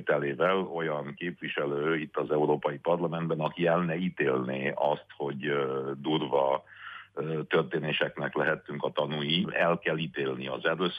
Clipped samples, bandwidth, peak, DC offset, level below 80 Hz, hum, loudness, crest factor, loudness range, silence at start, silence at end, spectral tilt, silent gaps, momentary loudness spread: under 0.1%; 5 kHz; -14 dBFS; under 0.1%; -72 dBFS; none; -30 LUFS; 16 dB; 1 LU; 0 s; 0 s; -8 dB/octave; none; 7 LU